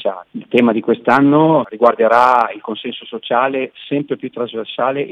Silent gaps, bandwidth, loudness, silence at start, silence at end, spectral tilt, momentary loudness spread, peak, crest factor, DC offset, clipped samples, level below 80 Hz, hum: none; 8.8 kHz; -15 LUFS; 0 s; 0.05 s; -7.5 dB/octave; 14 LU; 0 dBFS; 16 dB; under 0.1%; under 0.1%; -64 dBFS; none